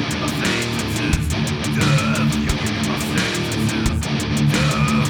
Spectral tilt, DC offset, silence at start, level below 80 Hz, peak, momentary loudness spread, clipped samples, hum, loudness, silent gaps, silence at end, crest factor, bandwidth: -4.5 dB/octave; under 0.1%; 0 s; -32 dBFS; -4 dBFS; 4 LU; under 0.1%; none; -19 LUFS; none; 0 s; 16 dB; over 20 kHz